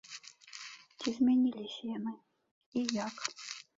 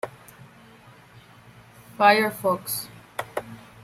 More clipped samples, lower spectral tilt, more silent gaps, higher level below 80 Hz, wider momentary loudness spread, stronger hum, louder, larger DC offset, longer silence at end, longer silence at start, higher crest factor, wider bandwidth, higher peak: neither; about the same, -3.5 dB/octave vs -3.5 dB/octave; first, 2.51-2.72 s vs none; second, -78 dBFS vs -66 dBFS; about the same, 20 LU vs 18 LU; neither; second, -34 LUFS vs -23 LUFS; neither; second, 0.15 s vs 0.3 s; about the same, 0.1 s vs 0.05 s; about the same, 24 dB vs 22 dB; second, 7.8 kHz vs 16 kHz; second, -12 dBFS vs -4 dBFS